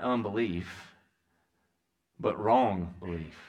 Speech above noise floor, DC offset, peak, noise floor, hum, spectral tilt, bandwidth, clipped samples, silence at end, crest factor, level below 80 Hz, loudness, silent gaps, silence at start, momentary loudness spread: 49 dB; under 0.1%; -12 dBFS; -79 dBFS; none; -7.5 dB/octave; 10 kHz; under 0.1%; 0 s; 20 dB; -58 dBFS; -30 LUFS; none; 0 s; 14 LU